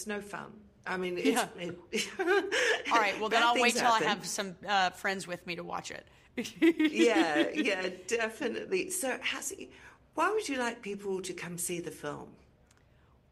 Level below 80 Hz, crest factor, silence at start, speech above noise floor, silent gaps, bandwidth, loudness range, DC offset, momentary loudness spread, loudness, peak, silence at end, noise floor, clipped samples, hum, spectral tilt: -68 dBFS; 20 dB; 0 s; 32 dB; none; 15.5 kHz; 7 LU; under 0.1%; 16 LU; -30 LUFS; -12 dBFS; 1 s; -63 dBFS; under 0.1%; none; -3 dB/octave